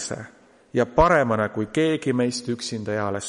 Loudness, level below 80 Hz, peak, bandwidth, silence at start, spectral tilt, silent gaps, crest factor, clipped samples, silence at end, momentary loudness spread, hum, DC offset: -23 LUFS; -42 dBFS; -2 dBFS; 11.5 kHz; 0 s; -5 dB/octave; none; 20 dB; under 0.1%; 0 s; 11 LU; none; under 0.1%